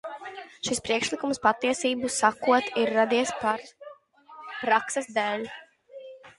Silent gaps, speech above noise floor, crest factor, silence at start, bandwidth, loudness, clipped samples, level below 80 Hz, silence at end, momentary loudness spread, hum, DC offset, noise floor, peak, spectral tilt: none; 25 dB; 22 dB; 0.05 s; 11.5 kHz; -26 LUFS; under 0.1%; -66 dBFS; 0.1 s; 20 LU; none; under 0.1%; -50 dBFS; -6 dBFS; -2.5 dB/octave